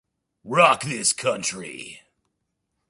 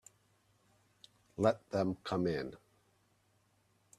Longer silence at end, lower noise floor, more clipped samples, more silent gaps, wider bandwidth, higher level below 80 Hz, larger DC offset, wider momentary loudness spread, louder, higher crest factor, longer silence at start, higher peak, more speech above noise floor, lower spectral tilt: second, 0.9 s vs 1.45 s; about the same, -77 dBFS vs -74 dBFS; neither; neither; second, 11.5 kHz vs 13.5 kHz; about the same, -68 dBFS vs -70 dBFS; neither; first, 19 LU vs 12 LU; first, -21 LUFS vs -35 LUFS; about the same, 22 dB vs 24 dB; second, 0.45 s vs 1.4 s; first, -2 dBFS vs -14 dBFS; first, 55 dB vs 39 dB; second, -2.5 dB/octave vs -6.5 dB/octave